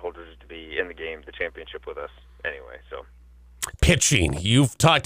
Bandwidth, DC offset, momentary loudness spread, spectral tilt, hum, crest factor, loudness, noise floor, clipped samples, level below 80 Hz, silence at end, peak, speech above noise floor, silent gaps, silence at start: 16 kHz; under 0.1%; 22 LU; -4 dB/octave; 60 Hz at -50 dBFS; 20 dB; -23 LUFS; -42 dBFS; under 0.1%; -36 dBFS; 0 s; -6 dBFS; 19 dB; none; 0 s